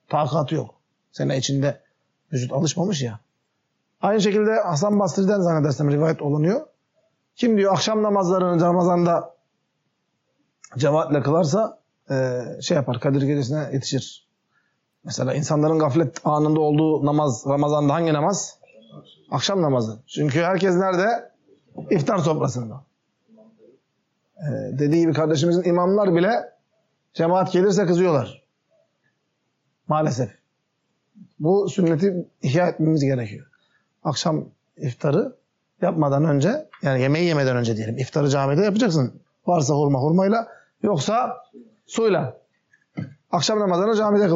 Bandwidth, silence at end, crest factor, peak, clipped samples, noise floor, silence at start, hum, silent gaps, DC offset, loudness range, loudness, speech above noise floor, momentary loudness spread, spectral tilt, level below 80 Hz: 8 kHz; 0 s; 12 dB; -8 dBFS; under 0.1%; -73 dBFS; 0.1 s; none; none; under 0.1%; 5 LU; -21 LUFS; 53 dB; 11 LU; -6 dB/octave; -68 dBFS